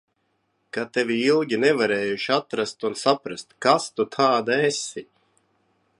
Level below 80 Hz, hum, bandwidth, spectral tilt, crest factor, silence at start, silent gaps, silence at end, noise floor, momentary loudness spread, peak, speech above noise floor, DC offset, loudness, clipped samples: -72 dBFS; none; 11.5 kHz; -4 dB/octave; 20 dB; 0.75 s; none; 0.95 s; -71 dBFS; 10 LU; -4 dBFS; 49 dB; under 0.1%; -23 LUFS; under 0.1%